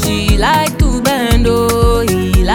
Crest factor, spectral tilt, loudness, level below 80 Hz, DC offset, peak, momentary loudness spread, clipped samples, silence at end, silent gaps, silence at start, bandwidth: 12 dB; -5 dB/octave; -12 LUFS; -16 dBFS; under 0.1%; 0 dBFS; 2 LU; under 0.1%; 0 s; none; 0 s; 19 kHz